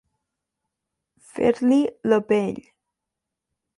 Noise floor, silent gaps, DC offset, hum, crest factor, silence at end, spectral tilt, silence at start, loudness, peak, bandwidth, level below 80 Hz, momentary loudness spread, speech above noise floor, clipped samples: -84 dBFS; none; under 0.1%; none; 18 dB; 1.2 s; -6.5 dB/octave; 1.35 s; -21 LUFS; -6 dBFS; 11.5 kHz; -62 dBFS; 15 LU; 64 dB; under 0.1%